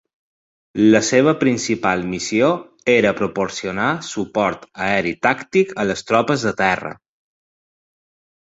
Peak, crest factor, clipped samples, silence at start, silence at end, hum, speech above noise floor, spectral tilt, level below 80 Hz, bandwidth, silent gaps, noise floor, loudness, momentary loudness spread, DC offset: -2 dBFS; 18 dB; under 0.1%; 0.75 s; 1.65 s; none; over 72 dB; -4.5 dB/octave; -54 dBFS; 8 kHz; none; under -90 dBFS; -18 LUFS; 8 LU; under 0.1%